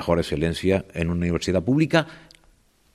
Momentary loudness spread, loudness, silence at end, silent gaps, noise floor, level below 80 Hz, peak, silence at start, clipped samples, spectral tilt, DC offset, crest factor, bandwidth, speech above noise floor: 5 LU; -23 LUFS; 0.75 s; none; -59 dBFS; -46 dBFS; -6 dBFS; 0 s; under 0.1%; -6.5 dB/octave; under 0.1%; 18 dB; 13.5 kHz; 37 dB